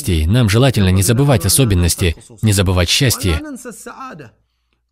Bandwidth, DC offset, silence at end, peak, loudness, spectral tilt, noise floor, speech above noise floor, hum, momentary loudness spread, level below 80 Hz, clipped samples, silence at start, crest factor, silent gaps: 16.5 kHz; under 0.1%; 0.65 s; 0 dBFS; -14 LUFS; -4.5 dB/octave; -65 dBFS; 51 dB; none; 19 LU; -28 dBFS; under 0.1%; 0 s; 14 dB; none